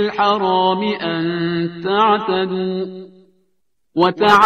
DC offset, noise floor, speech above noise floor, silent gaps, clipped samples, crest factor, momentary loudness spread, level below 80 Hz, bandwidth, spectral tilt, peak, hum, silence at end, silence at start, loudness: under 0.1%; -72 dBFS; 55 dB; none; under 0.1%; 16 dB; 10 LU; -58 dBFS; 13.5 kHz; -6 dB/octave; 0 dBFS; none; 0 s; 0 s; -17 LUFS